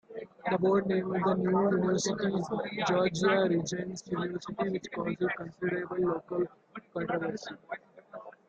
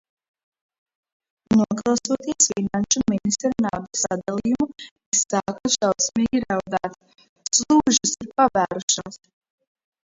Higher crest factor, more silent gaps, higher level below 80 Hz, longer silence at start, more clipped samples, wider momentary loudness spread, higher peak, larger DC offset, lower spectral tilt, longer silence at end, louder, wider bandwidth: about the same, 16 dB vs 20 dB; second, none vs 4.91-4.96 s, 5.06-5.12 s, 7.29-7.36 s, 8.83-8.88 s; second, -66 dBFS vs -54 dBFS; second, 0.1 s vs 1.5 s; neither; first, 15 LU vs 7 LU; second, -14 dBFS vs -2 dBFS; neither; first, -5.5 dB/octave vs -3 dB/octave; second, 0.15 s vs 0.9 s; second, -31 LUFS vs -21 LUFS; first, 9 kHz vs 8 kHz